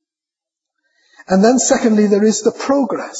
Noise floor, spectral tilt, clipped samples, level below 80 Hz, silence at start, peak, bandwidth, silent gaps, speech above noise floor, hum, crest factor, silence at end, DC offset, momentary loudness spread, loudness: -87 dBFS; -4.5 dB/octave; under 0.1%; -56 dBFS; 1.3 s; -2 dBFS; 8 kHz; none; 74 dB; none; 14 dB; 0 s; under 0.1%; 5 LU; -14 LUFS